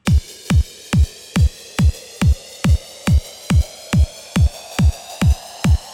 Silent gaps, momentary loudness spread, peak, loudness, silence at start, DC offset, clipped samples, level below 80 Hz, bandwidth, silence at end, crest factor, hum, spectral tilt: none; 1 LU; -4 dBFS; -19 LUFS; 0.05 s; under 0.1%; under 0.1%; -20 dBFS; 15.5 kHz; 0 s; 12 dB; none; -6 dB/octave